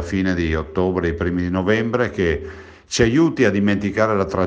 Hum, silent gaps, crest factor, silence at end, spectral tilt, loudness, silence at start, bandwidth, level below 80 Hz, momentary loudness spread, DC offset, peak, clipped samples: none; none; 18 dB; 0 s; -6 dB/octave; -19 LUFS; 0 s; 9.6 kHz; -40 dBFS; 6 LU; under 0.1%; -2 dBFS; under 0.1%